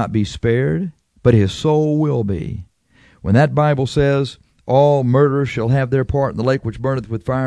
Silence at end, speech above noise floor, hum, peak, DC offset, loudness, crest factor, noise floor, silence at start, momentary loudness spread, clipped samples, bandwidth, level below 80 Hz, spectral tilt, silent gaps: 0 s; 36 dB; none; 0 dBFS; under 0.1%; -17 LUFS; 16 dB; -52 dBFS; 0 s; 10 LU; under 0.1%; 10.5 kHz; -40 dBFS; -8 dB/octave; none